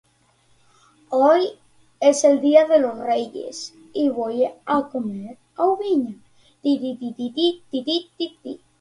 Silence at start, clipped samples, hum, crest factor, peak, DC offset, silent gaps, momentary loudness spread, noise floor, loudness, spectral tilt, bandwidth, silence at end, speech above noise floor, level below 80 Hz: 1.1 s; under 0.1%; none; 20 dB; -2 dBFS; under 0.1%; none; 16 LU; -60 dBFS; -21 LUFS; -4 dB/octave; 11.5 kHz; 0.25 s; 40 dB; -68 dBFS